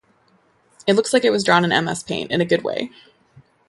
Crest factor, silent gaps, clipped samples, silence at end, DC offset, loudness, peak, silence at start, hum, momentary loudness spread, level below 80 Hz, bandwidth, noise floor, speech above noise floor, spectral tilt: 20 dB; none; under 0.1%; 0.8 s; under 0.1%; -19 LUFS; 0 dBFS; 0.85 s; none; 10 LU; -60 dBFS; 11.5 kHz; -59 dBFS; 40 dB; -4.5 dB/octave